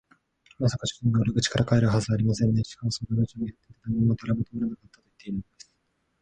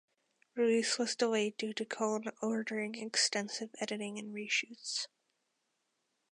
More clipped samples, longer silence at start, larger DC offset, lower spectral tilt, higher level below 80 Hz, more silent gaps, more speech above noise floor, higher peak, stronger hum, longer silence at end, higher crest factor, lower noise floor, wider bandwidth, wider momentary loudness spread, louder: neither; about the same, 0.6 s vs 0.55 s; neither; first, -6 dB/octave vs -2.5 dB/octave; first, -50 dBFS vs under -90 dBFS; neither; about the same, 48 dB vs 47 dB; first, -8 dBFS vs -18 dBFS; neither; second, 0.8 s vs 1.25 s; about the same, 18 dB vs 20 dB; second, -73 dBFS vs -82 dBFS; second, 9.4 kHz vs 11.5 kHz; first, 13 LU vs 10 LU; first, -26 LUFS vs -35 LUFS